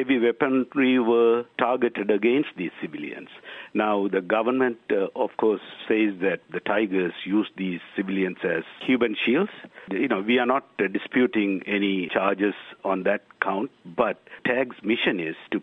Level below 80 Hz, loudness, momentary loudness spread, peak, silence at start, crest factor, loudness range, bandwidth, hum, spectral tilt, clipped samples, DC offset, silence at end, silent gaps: -68 dBFS; -24 LUFS; 9 LU; -4 dBFS; 0 s; 20 dB; 2 LU; 4 kHz; none; -8 dB/octave; under 0.1%; under 0.1%; 0 s; none